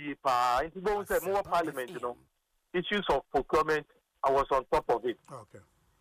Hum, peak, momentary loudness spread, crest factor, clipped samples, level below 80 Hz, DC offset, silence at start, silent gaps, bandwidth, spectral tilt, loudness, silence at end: none; -16 dBFS; 11 LU; 16 dB; under 0.1%; -54 dBFS; under 0.1%; 0 s; none; 15.5 kHz; -4.5 dB/octave; -30 LUFS; 0.4 s